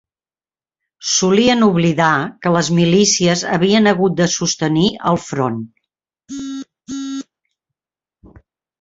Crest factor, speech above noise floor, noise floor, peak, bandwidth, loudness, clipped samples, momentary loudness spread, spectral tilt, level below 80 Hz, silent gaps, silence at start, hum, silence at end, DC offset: 16 dB; over 76 dB; under -90 dBFS; -2 dBFS; 8 kHz; -15 LUFS; under 0.1%; 16 LU; -4.5 dB/octave; -52 dBFS; none; 1 s; none; 1.6 s; under 0.1%